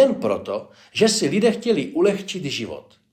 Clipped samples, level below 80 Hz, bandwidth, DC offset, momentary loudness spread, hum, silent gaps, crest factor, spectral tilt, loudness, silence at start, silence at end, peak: under 0.1%; -64 dBFS; 15 kHz; under 0.1%; 12 LU; none; none; 18 dB; -4.5 dB/octave; -21 LUFS; 0 s; 0.35 s; -4 dBFS